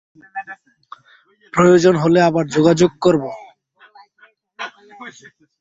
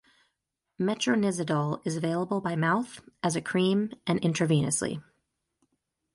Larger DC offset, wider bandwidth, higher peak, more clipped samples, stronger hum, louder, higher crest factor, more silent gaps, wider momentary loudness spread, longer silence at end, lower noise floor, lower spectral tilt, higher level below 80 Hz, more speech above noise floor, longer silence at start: neither; second, 7.8 kHz vs 11.5 kHz; first, 0 dBFS vs -12 dBFS; neither; neither; first, -14 LUFS vs -28 LUFS; about the same, 18 dB vs 16 dB; neither; first, 24 LU vs 6 LU; second, 0.5 s vs 1.15 s; second, -54 dBFS vs -83 dBFS; about the same, -6 dB/octave vs -5 dB/octave; first, -56 dBFS vs -66 dBFS; second, 39 dB vs 55 dB; second, 0.35 s vs 0.8 s